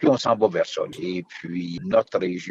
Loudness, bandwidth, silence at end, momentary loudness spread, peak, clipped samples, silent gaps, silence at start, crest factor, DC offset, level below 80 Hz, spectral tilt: -24 LUFS; 8.8 kHz; 0 s; 11 LU; -4 dBFS; under 0.1%; none; 0 s; 18 dB; under 0.1%; -62 dBFS; -6 dB/octave